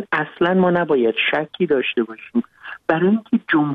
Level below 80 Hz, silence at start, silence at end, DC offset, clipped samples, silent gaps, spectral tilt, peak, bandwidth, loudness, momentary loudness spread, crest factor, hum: -60 dBFS; 0 s; 0 s; under 0.1%; under 0.1%; none; -8.5 dB/octave; -2 dBFS; 4.9 kHz; -19 LUFS; 8 LU; 16 dB; none